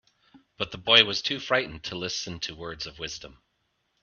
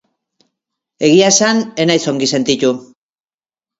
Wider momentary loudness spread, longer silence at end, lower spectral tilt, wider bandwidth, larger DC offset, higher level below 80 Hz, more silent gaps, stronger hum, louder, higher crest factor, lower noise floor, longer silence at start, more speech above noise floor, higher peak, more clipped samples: first, 18 LU vs 8 LU; second, 0.7 s vs 0.95 s; about the same, -2.5 dB/octave vs -3.5 dB/octave; second, 7.2 kHz vs 8 kHz; neither; about the same, -58 dBFS vs -58 dBFS; neither; neither; second, -25 LUFS vs -13 LUFS; first, 28 dB vs 16 dB; second, -75 dBFS vs under -90 dBFS; second, 0.35 s vs 1 s; second, 47 dB vs over 77 dB; about the same, -2 dBFS vs 0 dBFS; neither